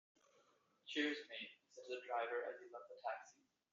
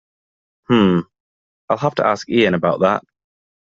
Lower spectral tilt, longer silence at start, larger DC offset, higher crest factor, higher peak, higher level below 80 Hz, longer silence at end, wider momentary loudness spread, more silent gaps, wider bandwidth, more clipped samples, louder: second, 1 dB/octave vs -6.5 dB/octave; first, 0.85 s vs 0.7 s; neither; about the same, 22 dB vs 18 dB; second, -26 dBFS vs 0 dBFS; second, under -90 dBFS vs -56 dBFS; second, 0.4 s vs 0.65 s; first, 16 LU vs 7 LU; second, none vs 1.20-1.68 s; about the same, 7.4 kHz vs 7.6 kHz; neither; second, -46 LUFS vs -17 LUFS